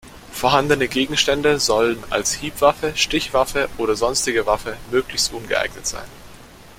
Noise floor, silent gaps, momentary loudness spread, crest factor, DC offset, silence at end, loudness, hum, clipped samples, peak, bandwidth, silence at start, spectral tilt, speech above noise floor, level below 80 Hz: -42 dBFS; none; 7 LU; 18 dB; under 0.1%; 0.05 s; -19 LUFS; none; under 0.1%; -2 dBFS; 16.5 kHz; 0.05 s; -2.5 dB/octave; 23 dB; -42 dBFS